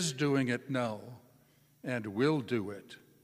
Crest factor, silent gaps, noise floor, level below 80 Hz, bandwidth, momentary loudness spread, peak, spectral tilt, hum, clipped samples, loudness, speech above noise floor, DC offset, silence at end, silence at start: 18 dB; none; -66 dBFS; -76 dBFS; 15.5 kHz; 17 LU; -16 dBFS; -5 dB/octave; none; under 0.1%; -33 LUFS; 33 dB; under 0.1%; 0.25 s; 0 s